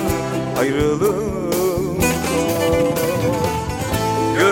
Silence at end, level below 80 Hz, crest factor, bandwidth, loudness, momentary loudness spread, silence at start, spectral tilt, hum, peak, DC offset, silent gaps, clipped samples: 0 s; -36 dBFS; 16 dB; 17 kHz; -19 LUFS; 4 LU; 0 s; -5 dB/octave; none; -2 dBFS; under 0.1%; none; under 0.1%